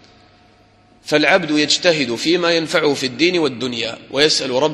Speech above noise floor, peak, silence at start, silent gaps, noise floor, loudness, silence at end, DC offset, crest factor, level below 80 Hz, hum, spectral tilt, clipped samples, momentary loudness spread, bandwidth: 34 dB; 0 dBFS; 1.05 s; none; -51 dBFS; -16 LUFS; 0 s; under 0.1%; 18 dB; -58 dBFS; none; -3 dB/octave; under 0.1%; 8 LU; 13 kHz